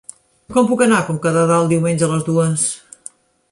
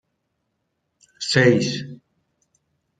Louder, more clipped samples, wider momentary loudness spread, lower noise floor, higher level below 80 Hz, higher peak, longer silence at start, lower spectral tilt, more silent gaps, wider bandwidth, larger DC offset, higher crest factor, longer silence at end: first, -16 LUFS vs -19 LUFS; neither; about the same, 18 LU vs 16 LU; second, -41 dBFS vs -75 dBFS; first, -56 dBFS vs -64 dBFS; about the same, -2 dBFS vs -2 dBFS; second, 0.5 s vs 1.2 s; about the same, -5.5 dB/octave vs -5 dB/octave; neither; first, 11.5 kHz vs 9.4 kHz; neither; second, 16 dB vs 22 dB; second, 0.75 s vs 1.05 s